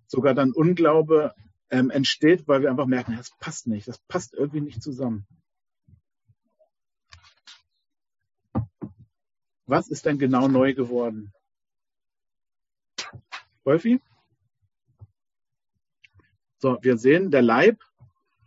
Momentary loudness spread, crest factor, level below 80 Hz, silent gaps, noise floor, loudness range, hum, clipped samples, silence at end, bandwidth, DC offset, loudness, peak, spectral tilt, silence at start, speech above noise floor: 17 LU; 20 dB; -58 dBFS; none; -70 dBFS; 16 LU; none; under 0.1%; 0.7 s; 8 kHz; under 0.1%; -22 LUFS; -6 dBFS; -6 dB/octave; 0.1 s; 48 dB